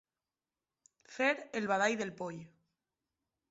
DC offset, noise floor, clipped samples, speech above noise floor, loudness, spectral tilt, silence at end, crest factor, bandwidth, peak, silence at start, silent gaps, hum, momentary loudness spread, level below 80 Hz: under 0.1%; under -90 dBFS; under 0.1%; over 56 dB; -34 LUFS; -2.5 dB/octave; 1.05 s; 22 dB; 7.6 kHz; -18 dBFS; 1.1 s; none; none; 16 LU; -80 dBFS